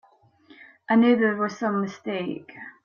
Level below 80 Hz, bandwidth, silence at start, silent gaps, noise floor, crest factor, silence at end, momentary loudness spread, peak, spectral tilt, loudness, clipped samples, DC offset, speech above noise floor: -72 dBFS; 7 kHz; 0.9 s; none; -56 dBFS; 16 dB; 0.15 s; 15 LU; -10 dBFS; -6.5 dB/octave; -23 LUFS; under 0.1%; under 0.1%; 32 dB